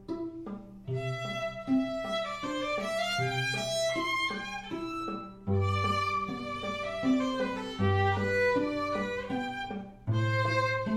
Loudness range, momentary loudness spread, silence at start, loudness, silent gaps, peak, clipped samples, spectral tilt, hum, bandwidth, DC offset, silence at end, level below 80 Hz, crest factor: 2 LU; 10 LU; 0 s; -31 LUFS; none; -16 dBFS; under 0.1%; -5.5 dB/octave; none; 15 kHz; under 0.1%; 0 s; -56 dBFS; 14 dB